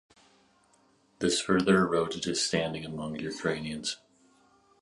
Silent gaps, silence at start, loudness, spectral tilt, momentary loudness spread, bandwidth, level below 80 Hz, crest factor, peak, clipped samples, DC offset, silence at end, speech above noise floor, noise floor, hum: none; 1.2 s; -29 LUFS; -4 dB/octave; 11 LU; 11.5 kHz; -60 dBFS; 20 dB; -10 dBFS; under 0.1%; under 0.1%; 0.85 s; 37 dB; -66 dBFS; none